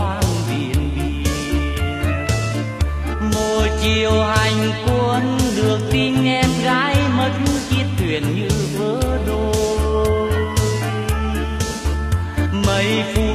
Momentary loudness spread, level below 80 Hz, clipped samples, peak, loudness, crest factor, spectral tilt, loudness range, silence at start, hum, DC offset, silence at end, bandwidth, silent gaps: 5 LU; -26 dBFS; under 0.1%; -2 dBFS; -19 LUFS; 16 dB; -5.5 dB/octave; 3 LU; 0 s; none; under 0.1%; 0 s; 15 kHz; none